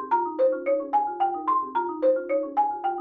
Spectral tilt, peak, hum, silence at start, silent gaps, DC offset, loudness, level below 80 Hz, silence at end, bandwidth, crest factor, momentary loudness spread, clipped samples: -7 dB/octave; -12 dBFS; none; 0 s; none; under 0.1%; -25 LUFS; -70 dBFS; 0 s; 4.6 kHz; 12 dB; 3 LU; under 0.1%